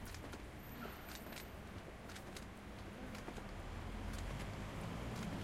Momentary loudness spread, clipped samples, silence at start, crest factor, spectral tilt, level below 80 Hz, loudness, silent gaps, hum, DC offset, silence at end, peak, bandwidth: 6 LU; under 0.1%; 0 s; 16 dB; -5 dB/octave; -54 dBFS; -49 LUFS; none; none; under 0.1%; 0 s; -32 dBFS; 16 kHz